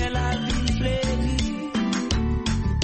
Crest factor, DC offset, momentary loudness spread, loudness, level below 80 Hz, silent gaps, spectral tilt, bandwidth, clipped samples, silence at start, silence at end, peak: 14 dB; under 0.1%; 2 LU; -25 LUFS; -28 dBFS; none; -5.5 dB/octave; 8.8 kHz; under 0.1%; 0 s; 0 s; -10 dBFS